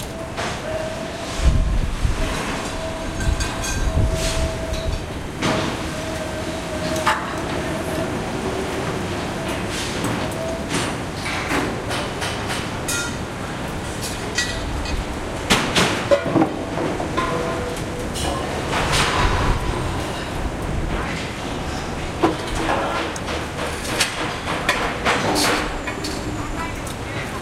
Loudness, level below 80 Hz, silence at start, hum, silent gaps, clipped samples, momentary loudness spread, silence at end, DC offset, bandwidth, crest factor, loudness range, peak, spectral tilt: -23 LUFS; -30 dBFS; 0 s; none; none; under 0.1%; 8 LU; 0 s; under 0.1%; 16 kHz; 22 dB; 4 LU; -2 dBFS; -4 dB/octave